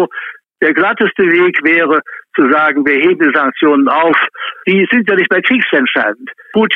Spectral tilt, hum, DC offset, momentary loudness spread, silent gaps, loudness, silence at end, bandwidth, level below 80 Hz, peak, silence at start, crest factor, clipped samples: -7.5 dB/octave; none; under 0.1%; 8 LU; none; -11 LUFS; 0 s; 4.5 kHz; -58 dBFS; 0 dBFS; 0 s; 12 dB; under 0.1%